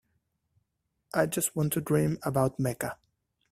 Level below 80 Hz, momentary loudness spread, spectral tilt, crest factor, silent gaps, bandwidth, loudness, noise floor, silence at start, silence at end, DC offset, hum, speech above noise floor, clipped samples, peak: -60 dBFS; 9 LU; -5.5 dB/octave; 20 dB; none; 16 kHz; -29 LUFS; -80 dBFS; 1.15 s; 0.6 s; under 0.1%; none; 51 dB; under 0.1%; -10 dBFS